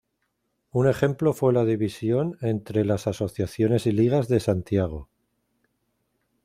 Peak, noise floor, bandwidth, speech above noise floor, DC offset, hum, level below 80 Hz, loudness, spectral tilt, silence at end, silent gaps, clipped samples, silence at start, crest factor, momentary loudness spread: -6 dBFS; -75 dBFS; 15 kHz; 52 dB; under 0.1%; none; -52 dBFS; -24 LUFS; -8 dB/octave; 1.4 s; none; under 0.1%; 0.75 s; 18 dB; 7 LU